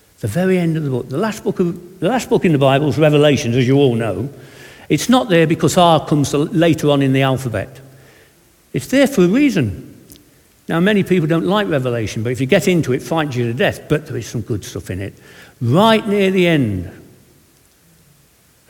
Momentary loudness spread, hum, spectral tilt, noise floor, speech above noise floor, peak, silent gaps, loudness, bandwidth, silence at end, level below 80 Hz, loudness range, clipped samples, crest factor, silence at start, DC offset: 12 LU; none; -6 dB/octave; -53 dBFS; 37 dB; 0 dBFS; none; -16 LUFS; 18 kHz; 1.7 s; -48 dBFS; 4 LU; under 0.1%; 16 dB; 0.25 s; under 0.1%